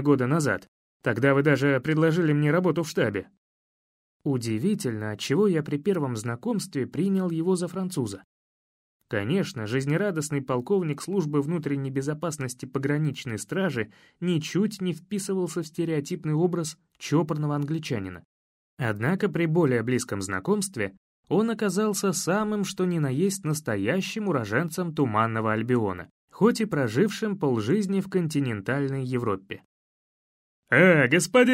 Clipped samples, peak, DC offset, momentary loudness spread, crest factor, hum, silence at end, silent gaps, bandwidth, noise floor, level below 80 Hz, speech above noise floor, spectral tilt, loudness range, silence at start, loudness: under 0.1%; -6 dBFS; under 0.1%; 9 LU; 20 dB; none; 0 s; 0.68-1.00 s, 3.37-4.20 s, 8.24-9.00 s, 18.25-18.77 s, 20.97-21.23 s, 26.11-26.28 s, 29.65-30.63 s; 16 kHz; under -90 dBFS; -66 dBFS; over 65 dB; -6 dB/octave; 4 LU; 0 s; -26 LUFS